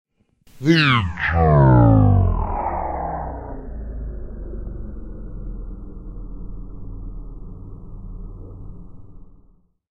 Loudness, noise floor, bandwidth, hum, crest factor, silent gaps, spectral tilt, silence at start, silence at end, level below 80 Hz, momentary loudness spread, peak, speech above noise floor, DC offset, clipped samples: -17 LUFS; -55 dBFS; 7.2 kHz; none; 20 dB; none; -8 dB/octave; 0.55 s; 0.7 s; -30 dBFS; 25 LU; -2 dBFS; 40 dB; under 0.1%; under 0.1%